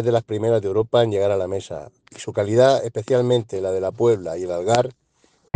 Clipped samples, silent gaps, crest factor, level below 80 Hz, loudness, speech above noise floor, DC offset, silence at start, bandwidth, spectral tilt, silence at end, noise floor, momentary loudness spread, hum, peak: under 0.1%; none; 20 dB; -60 dBFS; -20 LUFS; 41 dB; under 0.1%; 0 s; 9.6 kHz; -6 dB/octave; 0.65 s; -61 dBFS; 11 LU; none; 0 dBFS